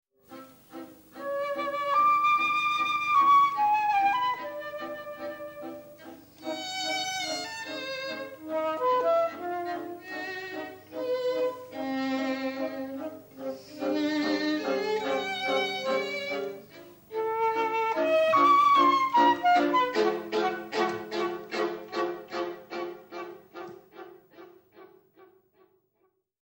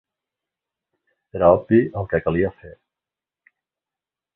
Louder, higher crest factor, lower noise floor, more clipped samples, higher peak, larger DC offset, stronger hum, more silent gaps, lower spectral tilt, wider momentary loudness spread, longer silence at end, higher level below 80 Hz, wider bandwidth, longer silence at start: second, -27 LUFS vs -19 LUFS; about the same, 18 dB vs 22 dB; second, -73 dBFS vs -89 dBFS; neither; second, -12 dBFS vs -2 dBFS; neither; neither; neither; second, -3.5 dB/octave vs -12 dB/octave; first, 19 LU vs 9 LU; about the same, 1.55 s vs 1.65 s; second, -72 dBFS vs -46 dBFS; first, 16 kHz vs 3.9 kHz; second, 0.3 s vs 1.35 s